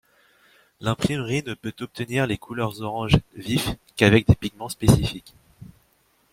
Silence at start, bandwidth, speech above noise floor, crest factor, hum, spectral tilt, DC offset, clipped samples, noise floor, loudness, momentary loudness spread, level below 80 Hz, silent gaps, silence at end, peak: 0.8 s; 16.5 kHz; 41 dB; 22 dB; none; -6 dB/octave; under 0.1%; under 0.1%; -64 dBFS; -23 LUFS; 14 LU; -40 dBFS; none; 0.65 s; -2 dBFS